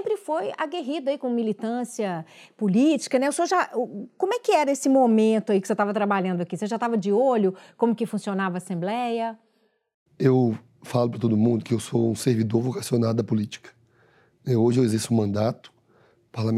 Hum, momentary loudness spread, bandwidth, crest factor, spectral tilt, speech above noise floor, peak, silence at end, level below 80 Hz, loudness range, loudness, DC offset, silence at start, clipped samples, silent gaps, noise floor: none; 9 LU; 14 kHz; 18 dB; -6.5 dB/octave; 44 dB; -6 dBFS; 0 s; -76 dBFS; 4 LU; -24 LUFS; under 0.1%; 0 s; under 0.1%; 9.94-10.06 s; -67 dBFS